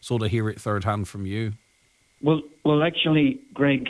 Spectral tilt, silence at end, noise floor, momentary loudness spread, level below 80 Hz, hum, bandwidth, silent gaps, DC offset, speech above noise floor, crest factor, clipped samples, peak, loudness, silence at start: -6.5 dB/octave; 0 s; -63 dBFS; 10 LU; -54 dBFS; none; 11 kHz; none; under 0.1%; 40 dB; 14 dB; under 0.1%; -10 dBFS; -24 LUFS; 0 s